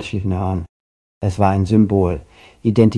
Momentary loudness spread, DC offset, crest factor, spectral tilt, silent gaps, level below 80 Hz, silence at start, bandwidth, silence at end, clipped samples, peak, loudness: 12 LU; under 0.1%; 16 dB; -8.5 dB/octave; 0.69-1.21 s; -42 dBFS; 0 s; 11 kHz; 0 s; under 0.1%; 0 dBFS; -18 LUFS